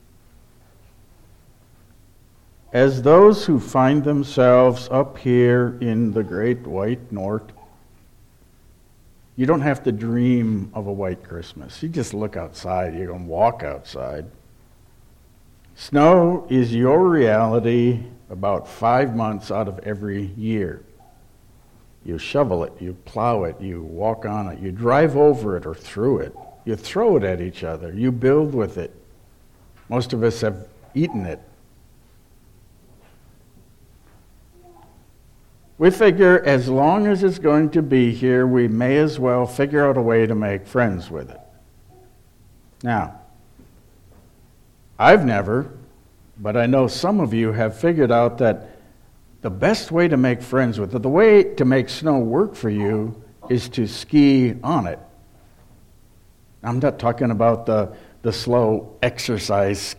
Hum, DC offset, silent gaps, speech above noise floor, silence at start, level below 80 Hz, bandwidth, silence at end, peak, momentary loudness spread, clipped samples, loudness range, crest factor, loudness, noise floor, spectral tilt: none; under 0.1%; none; 33 dB; 2.75 s; -48 dBFS; 15 kHz; 0.05 s; 0 dBFS; 16 LU; under 0.1%; 10 LU; 20 dB; -19 LUFS; -51 dBFS; -7 dB/octave